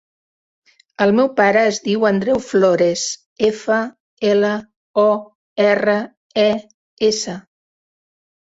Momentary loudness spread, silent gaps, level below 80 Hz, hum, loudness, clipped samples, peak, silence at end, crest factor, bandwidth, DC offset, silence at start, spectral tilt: 10 LU; 3.26-3.36 s, 4.00-4.17 s, 4.76-4.94 s, 5.35-5.56 s, 6.17-6.30 s, 6.74-6.97 s; -60 dBFS; none; -17 LUFS; under 0.1%; -2 dBFS; 1.05 s; 16 dB; 8 kHz; under 0.1%; 1 s; -4.5 dB/octave